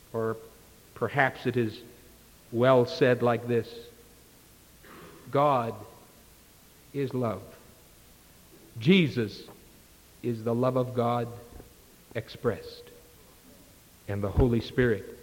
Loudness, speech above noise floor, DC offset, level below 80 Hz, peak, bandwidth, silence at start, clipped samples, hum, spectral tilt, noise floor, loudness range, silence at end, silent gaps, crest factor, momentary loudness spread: -28 LUFS; 29 dB; under 0.1%; -48 dBFS; -8 dBFS; 17 kHz; 0.15 s; under 0.1%; none; -7 dB/octave; -56 dBFS; 7 LU; 0 s; none; 22 dB; 24 LU